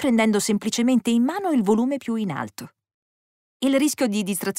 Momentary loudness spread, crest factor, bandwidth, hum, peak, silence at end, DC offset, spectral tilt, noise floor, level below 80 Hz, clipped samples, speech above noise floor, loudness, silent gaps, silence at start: 8 LU; 14 dB; 16 kHz; none; -8 dBFS; 0 s; under 0.1%; -4.5 dB/octave; under -90 dBFS; -66 dBFS; under 0.1%; over 69 dB; -22 LUFS; 2.94-3.60 s; 0 s